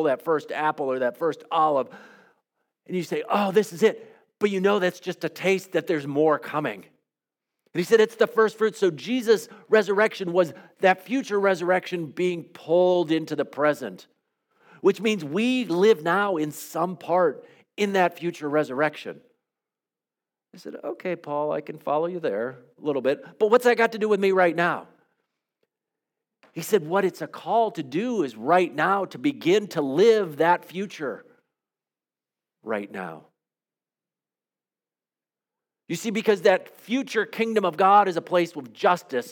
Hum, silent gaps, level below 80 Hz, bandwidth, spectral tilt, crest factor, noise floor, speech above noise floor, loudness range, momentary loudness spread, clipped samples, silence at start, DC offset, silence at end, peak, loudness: none; none; -84 dBFS; 18.5 kHz; -5.5 dB/octave; 20 dB; under -90 dBFS; over 67 dB; 8 LU; 12 LU; under 0.1%; 0 s; under 0.1%; 0 s; -6 dBFS; -24 LUFS